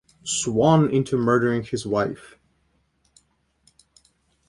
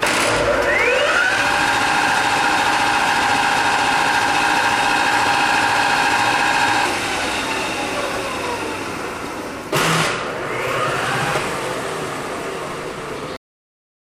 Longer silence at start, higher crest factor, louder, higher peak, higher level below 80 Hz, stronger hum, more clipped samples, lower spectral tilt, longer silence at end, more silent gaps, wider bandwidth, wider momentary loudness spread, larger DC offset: first, 0.25 s vs 0 s; first, 20 dB vs 14 dB; second, -21 LUFS vs -18 LUFS; about the same, -4 dBFS vs -4 dBFS; second, -56 dBFS vs -46 dBFS; neither; neither; first, -5.5 dB/octave vs -2.5 dB/octave; first, 2.3 s vs 0.7 s; neither; second, 11.5 kHz vs 16.5 kHz; about the same, 9 LU vs 11 LU; neither